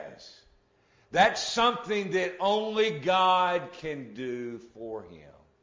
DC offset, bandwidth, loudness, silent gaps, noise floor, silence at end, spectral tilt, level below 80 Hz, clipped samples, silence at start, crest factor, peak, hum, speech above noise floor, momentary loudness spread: under 0.1%; 7.6 kHz; -27 LUFS; none; -65 dBFS; 0.3 s; -3.5 dB/octave; -64 dBFS; under 0.1%; 0 s; 20 dB; -8 dBFS; none; 37 dB; 17 LU